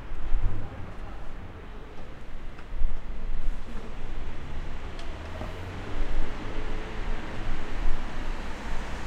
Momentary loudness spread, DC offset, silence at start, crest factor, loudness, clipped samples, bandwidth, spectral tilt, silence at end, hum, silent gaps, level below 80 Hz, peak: 9 LU; under 0.1%; 0 s; 16 dB; -38 LUFS; under 0.1%; 5.4 kHz; -6 dB/octave; 0 s; none; none; -30 dBFS; -8 dBFS